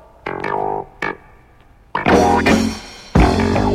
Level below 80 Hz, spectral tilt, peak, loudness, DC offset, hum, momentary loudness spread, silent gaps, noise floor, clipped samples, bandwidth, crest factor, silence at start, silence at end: -28 dBFS; -6 dB/octave; 0 dBFS; -17 LUFS; under 0.1%; none; 14 LU; none; -47 dBFS; under 0.1%; 15.5 kHz; 18 dB; 0.25 s; 0 s